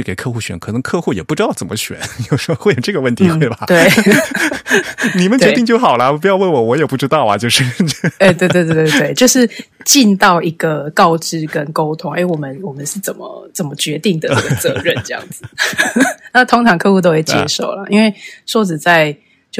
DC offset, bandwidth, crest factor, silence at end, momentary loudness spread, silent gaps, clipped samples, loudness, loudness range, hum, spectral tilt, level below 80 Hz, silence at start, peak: under 0.1%; 18.5 kHz; 14 dB; 0 s; 11 LU; none; under 0.1%; -13 LUFS; 6 LU; none; -4.5 dB/octave; -50 dBFS; 0 s; 0 dBFS